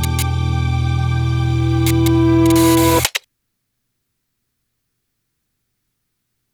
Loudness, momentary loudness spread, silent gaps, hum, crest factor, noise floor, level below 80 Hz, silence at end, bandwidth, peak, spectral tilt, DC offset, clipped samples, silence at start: -15 LUFS; 7 LU; none; none; 16 dB; -73 dBFS; -30 dBFS; 3.35 s; over 20 kHz; -2 dBFS; -5.5 dB/octave; under 0.1%; under 0.1%; 0 s